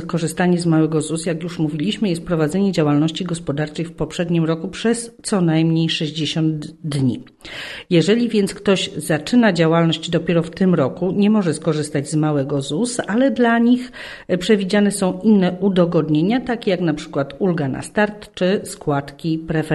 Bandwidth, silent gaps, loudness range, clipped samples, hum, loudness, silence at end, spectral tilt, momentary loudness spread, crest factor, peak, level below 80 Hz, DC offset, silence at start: 12.5 kHz; none; 3 LU; under 0.1%; none; -19 LUFS; 0 s; -6 dB/octave; 8 LU; 16 dB; -2 dBFS; -50 dBFS; under 0.1%; 0 s